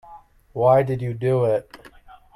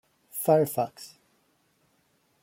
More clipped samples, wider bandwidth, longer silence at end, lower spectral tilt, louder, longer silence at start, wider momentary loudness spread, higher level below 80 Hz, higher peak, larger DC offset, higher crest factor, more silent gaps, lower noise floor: neither; second, 12 kHz vs 16.5 kHz; second, 0.6 s vs 1.35 s; first, -9 dB/octave vs -6 dB/octave; first, -21 LUFS vs -26 LUFS; second, 0.1 s vs 0.35 s; second, 9 LU vs 23 LU; first, -54 dBFS vs -74 dBFS; first, -4 dBFS vs -8 dBFS; neither; about the same, 18 dB vs 22 dB; neither; second, -47 dBFS vs -69 dBFS